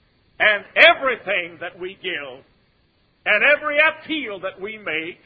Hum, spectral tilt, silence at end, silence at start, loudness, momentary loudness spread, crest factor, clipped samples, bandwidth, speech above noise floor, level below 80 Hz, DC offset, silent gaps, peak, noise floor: none; -4.5 dB/octave; 0.1 s; 0.4 s; -18 LUFS; 18 LU; 22 dB; under 0.1%; 8 kHz; 42 dB; -62 dBFS; under 0.1%; none; 0 dBFS; -62 dBFS